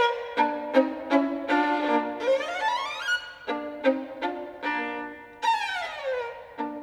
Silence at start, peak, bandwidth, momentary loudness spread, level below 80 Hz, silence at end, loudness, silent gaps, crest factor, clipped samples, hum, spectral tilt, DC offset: 0 s; -8 dBFS; 12.5 kHz; 9 LU; -66 dBFS; 0 s; -27 LUFS; none; 20 dB; under 0.1%; none; -3 dB/octave; under 0.1%